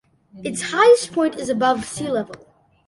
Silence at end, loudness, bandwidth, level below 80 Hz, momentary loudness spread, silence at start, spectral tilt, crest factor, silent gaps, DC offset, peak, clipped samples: 0.5 s; -19 LUFS; 11.5 kHz; -58 dBFS; 15 LU; 0.35 s; -3.5 dB/octave; 18 dB; none; under 0.1%; -4 dBFS; under 0.1%